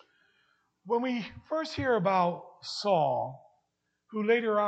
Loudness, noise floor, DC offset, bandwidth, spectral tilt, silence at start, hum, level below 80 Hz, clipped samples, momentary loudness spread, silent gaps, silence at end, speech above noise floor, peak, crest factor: -30 LUFS; -80 dBFS; under 0.1%; 8.8 kHz; -6 dB/octave; 0.85 s; none; -66 dBFS; under 0.1%; 12 LU; none; 0 s; 51 dB; -12 dBFS; 18 dB